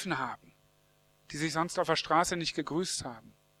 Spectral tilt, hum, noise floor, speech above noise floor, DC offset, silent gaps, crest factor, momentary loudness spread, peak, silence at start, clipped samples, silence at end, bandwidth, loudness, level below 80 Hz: -3.5 dB/octave; 50 Hz at -65 dBFS; -67 dBFS; 35 dB; under 0.1%; none; 22 dB; 17 LU; -12 dBFS; 0 s; under 0.1%; 0.3 s; 15 kHz; -31 LUFS; -62 dBFS